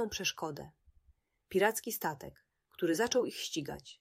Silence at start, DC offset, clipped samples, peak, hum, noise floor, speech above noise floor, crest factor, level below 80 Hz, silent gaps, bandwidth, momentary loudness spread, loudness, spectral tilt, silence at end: 0 s; under 0.1%; under 0.1%; -16 dBFS; none; -71 dBFS; 36 dB; 22 dB; -66 dBFS; none; 16 kHz; 17 LU; -34 LUFS; -3 dB/octave; 0.05 s